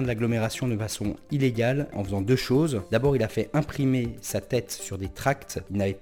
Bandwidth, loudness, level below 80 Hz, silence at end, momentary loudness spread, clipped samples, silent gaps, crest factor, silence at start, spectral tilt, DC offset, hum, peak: 18.5 kHz; -27 LUFS; -48 dBFS; 0 s; 8 LU; under 0.1%; none; 16 dB; 0 s; -6 dB/octave; under 0.1%; none; -10 dBFS